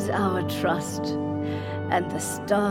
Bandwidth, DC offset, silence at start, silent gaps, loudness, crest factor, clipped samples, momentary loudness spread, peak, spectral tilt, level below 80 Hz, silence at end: 17 kHz; under 0.1%; 0 s; none; -27 LUFS; 16 dB; under 0.1%; 5 LU; -10 dBFS; -5.5 dB/octave; -56 dBFS; 0 s